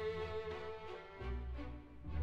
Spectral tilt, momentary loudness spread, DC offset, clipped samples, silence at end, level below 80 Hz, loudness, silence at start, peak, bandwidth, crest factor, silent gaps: -7.5 dB/octave; 8 LU; under 0.1%; under 0.1%; 0 s; -50 dBFS; -46 LUFS; 0 s; -30 dBFS; 7.8 kHz; 14 dB; none